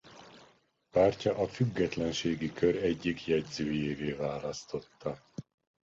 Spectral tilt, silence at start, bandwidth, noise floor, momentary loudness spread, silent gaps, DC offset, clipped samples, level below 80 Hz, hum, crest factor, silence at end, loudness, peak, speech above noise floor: -6 dB/octave; 0.05 s; 7.8 kHz; -65 dBFS; 14 LU; none; under 0.1%; under 0.1%; -58 dBFS; none; 20 dB; 0.45 s; -32 LUFS; -14 dBFS; 34 dB